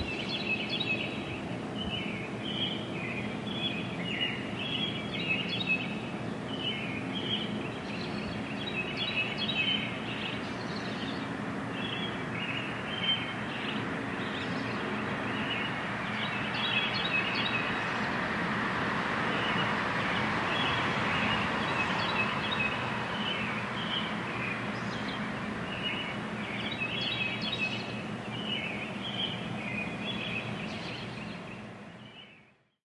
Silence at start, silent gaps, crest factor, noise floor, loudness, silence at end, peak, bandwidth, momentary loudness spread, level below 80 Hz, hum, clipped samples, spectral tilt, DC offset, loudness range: 0 s; none; 16 dB; -62 dBFS; -32 LUFS; 0.4 s; -16 dBFS; 11.5 kHz; 7 LU; -60 dBFS; none; under 0.1%; -5 dB/octave; under 0.1%; 5 LU